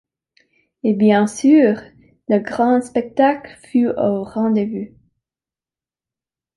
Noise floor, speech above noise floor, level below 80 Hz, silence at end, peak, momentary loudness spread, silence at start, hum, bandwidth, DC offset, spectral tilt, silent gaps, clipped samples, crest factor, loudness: under -90 dBFS; over 74 dB; -60 dBFS; 1.7 s; -2 dBFS; 13 LU; 0.85 s; none; 11.5 kHz; under 0.1%; -6.5 dB/octave; none; under 0.1%; 16 dB; -17 LUFS